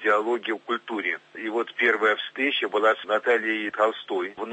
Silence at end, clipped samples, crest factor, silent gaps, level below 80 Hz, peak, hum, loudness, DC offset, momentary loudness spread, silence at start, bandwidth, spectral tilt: 0 s; under 0.1%; 16 dB; none; -80 dBFS; -8 dBFS; none; -25 LUFS; under 0.1%; 7 LU; 0 s; 8.4 kHz; -3.5 dB/octave